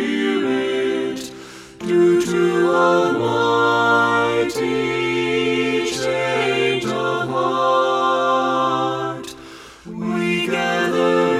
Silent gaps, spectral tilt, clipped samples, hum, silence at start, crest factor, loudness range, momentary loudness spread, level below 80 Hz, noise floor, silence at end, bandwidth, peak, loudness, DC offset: none; -5 dB/octave; under 0.1%; none; 0 s; 14 dB; 3 LU; 13 LU; -56 dBFS; -39 dBFS; 0 s; 14 kHz; -4 dBFS; -18 LUFS; under 0.1%